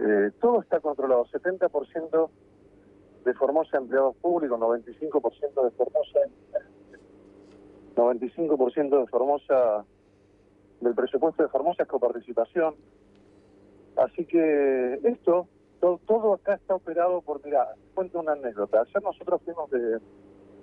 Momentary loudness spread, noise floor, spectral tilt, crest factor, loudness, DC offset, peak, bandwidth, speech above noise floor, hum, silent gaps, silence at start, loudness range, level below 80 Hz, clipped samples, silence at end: 7 LU; -59 dBFS; -9 dB/octave; 16 dB; -26 LUFS; under 0.1%; -12 dBFS; 3.8 kHz; 34 dB; 50 Hz at -65 dBFS; none; 0 s; 3 LU; -68 dBFS; under 0.1%; 0.65 s